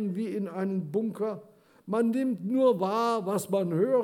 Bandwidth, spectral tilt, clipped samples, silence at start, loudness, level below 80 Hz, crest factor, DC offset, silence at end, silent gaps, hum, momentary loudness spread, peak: 18 kHz; -7 dB/octave; under 0.1%; 0 s; -28 LUFS; -84 dBFS; 16 dB; under 0.1%; 0 s; none; none; 8 LU; -12 dBFS